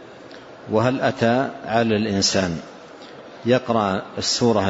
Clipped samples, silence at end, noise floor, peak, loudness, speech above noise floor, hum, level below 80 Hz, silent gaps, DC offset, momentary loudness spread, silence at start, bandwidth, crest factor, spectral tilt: under 0.1%; 0 s; -41 dBFS; -4 dBFS; -21 LUFS; 21 dB; none; -54 dBFS; none; under 0.1%; 21 LU; 0 s; 8 kHz; 16 dB; -4.5 dB/octave